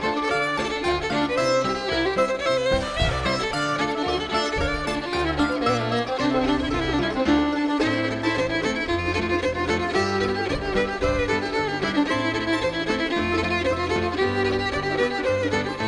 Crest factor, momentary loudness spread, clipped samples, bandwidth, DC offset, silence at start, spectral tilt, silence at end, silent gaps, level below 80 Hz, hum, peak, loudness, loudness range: 14 dB; 3 LU; under 0.1%; 10.5 kHz; under 0.1%; 0 s; -5 dB/octave; 0 s; none; -38 dBFS; none; -8 dBFS; -23 LUFS; 1 LU